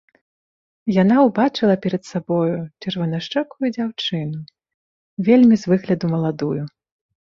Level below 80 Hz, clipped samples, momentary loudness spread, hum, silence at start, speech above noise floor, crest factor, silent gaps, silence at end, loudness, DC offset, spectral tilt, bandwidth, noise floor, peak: -60 dBFS; under 0.1%; 13 LU; none; 0.85 s; over 72 dB; 18 dB; 4.74-5.17 s; 0.6 s; -19 LUFS; under 0.1%; -7.5 dB/octave; 7.4 kHz; under -90 dBFS; -2 dBFS